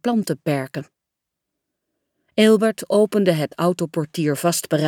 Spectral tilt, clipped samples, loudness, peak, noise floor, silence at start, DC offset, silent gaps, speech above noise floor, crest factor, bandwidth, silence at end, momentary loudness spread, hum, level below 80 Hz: -5.5 dB/octave; under 0.1%; -20 LUFS; -4 dBFS; -82 dBFS; 0.05 s; under 0.1%; none; 63 dB; 18 dB; 19.5 kHz; 0 s; 9 LU; none; -70 dBFS